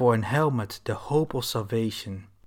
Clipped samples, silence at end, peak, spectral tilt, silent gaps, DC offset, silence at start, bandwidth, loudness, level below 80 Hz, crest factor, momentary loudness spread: under 0.1%; 0.2 s; -10 dBFS; -6 dB/octave; none; under 0.1%; 0 s; 18 kHz; -27 LUFS; -56 dBFS; 16 dB; 9 LU